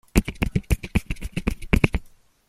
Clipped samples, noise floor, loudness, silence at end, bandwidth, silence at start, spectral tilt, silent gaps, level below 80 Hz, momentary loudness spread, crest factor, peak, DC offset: under 0.1%; -46 dBFS; -25 LUFS; 0.4 s; 15.5 kHz; 0.15 s; -6 dB/octave; none; -28 dBFS; 8 LU; 24 dB; 0 dBFS; under 0.1%